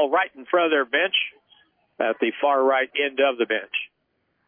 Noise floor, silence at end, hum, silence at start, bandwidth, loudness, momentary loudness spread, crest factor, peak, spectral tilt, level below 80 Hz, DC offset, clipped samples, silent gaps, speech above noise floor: -72 dBFS; 0.65 s; none; 0 s; 3.6 kHz; -22 LUFS; 8 LU; 14 dB; -8 dBFS; -6 dB/octave; -82 dBFS; under 0.1%; under 0.1%; none; 50 dB